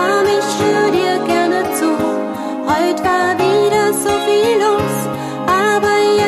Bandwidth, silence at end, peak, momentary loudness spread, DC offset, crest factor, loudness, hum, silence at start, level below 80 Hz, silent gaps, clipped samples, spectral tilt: 14 kHz; 0 s; -2 dBFS; 6 LU; under 0.1%; 12 dB; -15 LUFS; none; 0 s; -48 dBFS; none; under 0.1%; -4 dB/octave